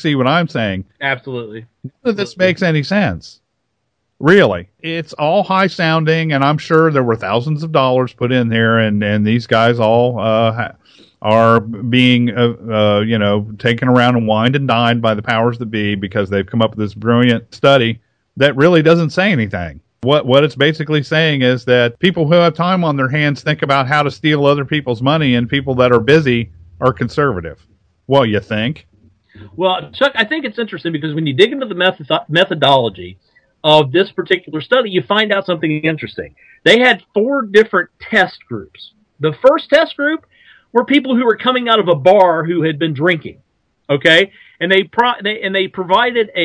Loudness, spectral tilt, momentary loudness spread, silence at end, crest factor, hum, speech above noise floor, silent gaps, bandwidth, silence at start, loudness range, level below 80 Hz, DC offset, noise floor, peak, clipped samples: -14 LUFS; -6.5 dB/octave; 10 LU; 0 s; 14 dB; none; 56 dB; none; 11 kHz; 0 s; 3 LU; -50 dBFS; under 0.1%; -70 dBFS; 0 dBFS; 0.2%